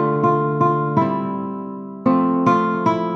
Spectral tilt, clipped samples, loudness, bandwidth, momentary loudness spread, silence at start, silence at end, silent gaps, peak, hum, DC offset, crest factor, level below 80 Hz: -9 dB/octave; under 0.1%; -19 LUFS; 6.6 kHz; 10 LU; 0 s; 0 s; none; -2 dBFS; none; under 0.1%; 16 dB; -62 dBFS